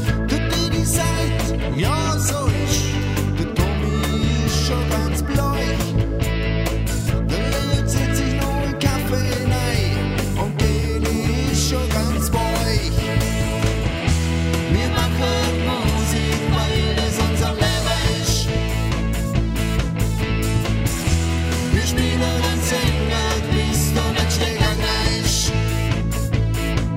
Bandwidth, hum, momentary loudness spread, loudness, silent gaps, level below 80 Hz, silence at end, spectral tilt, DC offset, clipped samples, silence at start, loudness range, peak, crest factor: 16.5 kHz; none; 3 LU; -20 LUFS; none; -24 dBFS; 0 s; -5 dB/octave; under 0.1%; under 0.1%; 0 s; 2 LU; -4 dBFS; 16 dB